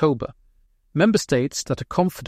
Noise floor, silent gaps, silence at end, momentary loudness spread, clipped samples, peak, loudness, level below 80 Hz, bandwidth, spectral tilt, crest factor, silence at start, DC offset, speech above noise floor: -59 dBFS; none; 0 s; 11 LU; under 0.1%; -4 dBFS; -22 LUFS; -50 dBFS; 16 kHz; -5.5 dB/octave; 18 dB; 0 s; under 0.1%; 38 dB